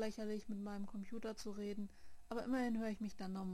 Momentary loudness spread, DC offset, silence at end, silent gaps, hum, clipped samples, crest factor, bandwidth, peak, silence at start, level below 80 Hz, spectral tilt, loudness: 8 LU; 0.2%; 0 s; none; none; under 0.1%; 16 dB; 15 kHz; -28 dBFS; 0 s; -64 dBFS; -6 dB/octave; -45 LUFS